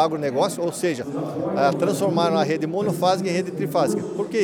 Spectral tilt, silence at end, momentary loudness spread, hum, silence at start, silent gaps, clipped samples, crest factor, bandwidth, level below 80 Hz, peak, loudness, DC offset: -5.5 dB/octave; 0 s; 5 LU; none; 0 s; none; under 0.1%; 16 dB; 19.5 kHz; -66 dBFS; -6 dBFS; -22 LUFS; under 0.1%